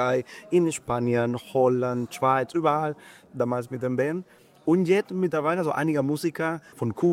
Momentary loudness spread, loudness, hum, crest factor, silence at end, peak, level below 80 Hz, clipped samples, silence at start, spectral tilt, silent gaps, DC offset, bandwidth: 8 LU; -25 LUFS; none; 16 dB; 0 s; -8 dBFS; -64 dBFS; under 0.1%; 0 s; -6.5 dB/octave; none; under 0.1%; 15.5 kHz